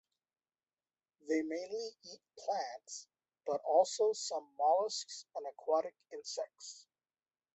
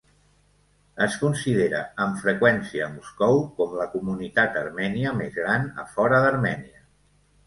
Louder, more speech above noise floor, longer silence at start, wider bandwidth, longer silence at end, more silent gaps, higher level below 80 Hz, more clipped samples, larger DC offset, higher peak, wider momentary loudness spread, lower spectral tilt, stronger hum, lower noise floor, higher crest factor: second, -37 LUFS vs -24 LUFS; first, over 53 dB vs 38 dB; first, 1.25 s vs 0.95 s; second, 8.2 kHz vs 11.5 kHz; about the same, 0.75 s vs 0.8 s; neither; second, under -90 dBFS vs -56 dBFS; neither; neither; second, -16 dBFS vs -2 dBFS; first, 18 LU vs 9 LU; second, -2 dB/octave vs -6 dB/octave; second, none vs 50 Hz at -50 dBFS; first, under -90 dBFS vs -62 dBFS; about the same, 22 dB vs 22 dB